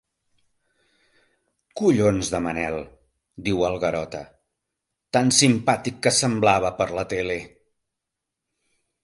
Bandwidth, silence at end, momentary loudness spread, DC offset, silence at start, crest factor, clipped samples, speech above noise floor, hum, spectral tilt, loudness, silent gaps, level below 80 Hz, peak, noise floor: 11.5 kHz; 1.55 s; 14 LU; under 0.1%; 1.75 s; 22 dB; under 0.1%; 62 dB; none; -4 dB/octave; -22 LUFS; none; -50 dBFS; -2 dBFS; -84 dBFS